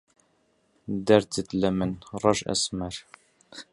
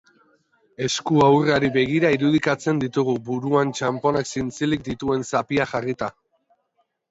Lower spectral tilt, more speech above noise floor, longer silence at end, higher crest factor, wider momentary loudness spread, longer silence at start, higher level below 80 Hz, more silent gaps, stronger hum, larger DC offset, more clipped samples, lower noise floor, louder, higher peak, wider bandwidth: about the same, -4.5 dB/octave vs -5.5 dB/octave; second, 42 dB vs 50 dB; second, 0.1 s vs 1 s; first, 24 dB vs 18 dB; first, 20 LU vs 8 LU; about the same, 0.9 s vs 0.8 s; about the same, -54 dBFS vs -54 dBFS; neither; neither; neither; neither; about the same, -68 dBFS vs -70 dBFS; second, -26 LUFS vs -21 LUFS; about the same, -4 dBFS vs -4 dBFS; first, 11.5 kHz vs 8 kHz